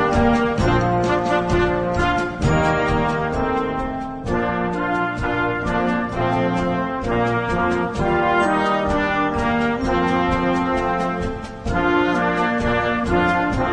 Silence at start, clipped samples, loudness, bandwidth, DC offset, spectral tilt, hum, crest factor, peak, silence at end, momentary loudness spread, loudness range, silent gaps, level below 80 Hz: 0 s; under 0.1%; -20 LUFS; 10.5 kHz; under 0.1%; -6.5 dB/octave; none; 14 dB; -6 dBFS; 0 s; 4 LU; 2 LU; none; -32 dBFS